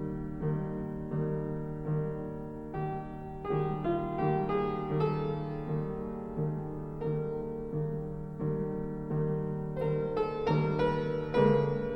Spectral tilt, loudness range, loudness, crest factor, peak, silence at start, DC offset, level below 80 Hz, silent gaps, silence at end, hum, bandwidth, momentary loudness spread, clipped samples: -10 dB/octave; 4 LU; -33 LUFS; 18 dB; -14 dBFS; 0 s; under 0.1%; -50 dBFS; none; 0 s; none; 5.8 kHz; 9 LU; under 0.1%